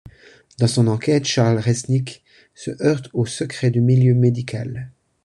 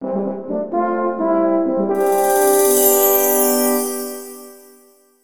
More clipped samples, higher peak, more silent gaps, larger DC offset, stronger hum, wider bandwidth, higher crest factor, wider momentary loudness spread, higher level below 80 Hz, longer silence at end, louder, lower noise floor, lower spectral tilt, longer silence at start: neither; about the same, -2 dBFS vs -2 dBFS; neither; second, under 0.1% vs 0.7%; neither; second, 11 kHz vs 18 kHz; about the same, 16 dB vs 14 dB; first, 16 LU vs 12 LU; first, -50 dBFS vs -60 dBFS; second, 0.35 s vs 0.6 s; second, -19 LUFS vs -16 LUFS; about the same, -48 dBFS vs -51 dBFS; first, -6.5 dB/octave vs -3.5 dB/octave; first, 0.6 s vs 0 s